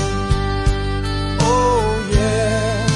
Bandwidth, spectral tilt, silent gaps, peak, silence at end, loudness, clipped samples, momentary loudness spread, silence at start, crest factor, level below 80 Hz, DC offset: 11.5 kHz; -5.5 dB/octave; none; -4 dBFS; 0 s; -18 LUFS; under 0.1%; 6 LU; 0 s; 14 dB; -24 dBFS; under 0.1%